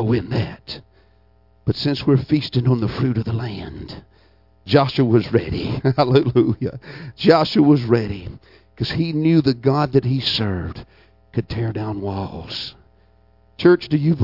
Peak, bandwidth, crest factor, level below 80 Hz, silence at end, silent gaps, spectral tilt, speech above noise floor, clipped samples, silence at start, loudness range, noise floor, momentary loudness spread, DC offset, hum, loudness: 0 dBFS; 5.8 kHz; 20 dB; -46 dBFS; 0 s; none; -8.5 dB/octave; 37 dB; under 0.1%; 0 s; 5 LU; -55 dBFS; 17 LU; under 0.1%; none; -19 LUFS